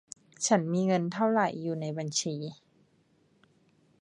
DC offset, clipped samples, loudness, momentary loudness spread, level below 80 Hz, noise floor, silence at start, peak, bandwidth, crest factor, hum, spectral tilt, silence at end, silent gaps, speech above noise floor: under 0.1%; under 0.1%; -29 LUFS; 11 LU; -78 dBFS; -67 dBFS; 0.4 s; -10 dBFS; 11 kHz; 22 dB; none; -4.5 dB/octave; 1.45 s; none; 39 dB